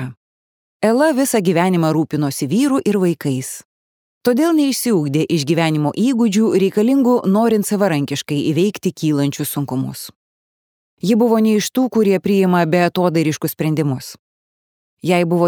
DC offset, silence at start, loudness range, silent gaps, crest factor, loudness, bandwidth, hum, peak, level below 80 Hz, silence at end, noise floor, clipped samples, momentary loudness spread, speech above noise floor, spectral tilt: under 0.1%; 0 s; 3 LU; 0.17-0.80 s, 3.65-4.21 s, 10.16-10.97 s, 14.19-14.97 s; 16 dB; -17 LUFS; 20 kHz; none; -2 dBFS; -64 dBFS; 0 s; under -90 dBFS; under 0.1%; 8 LU; over 74 dB; -6 dB/octave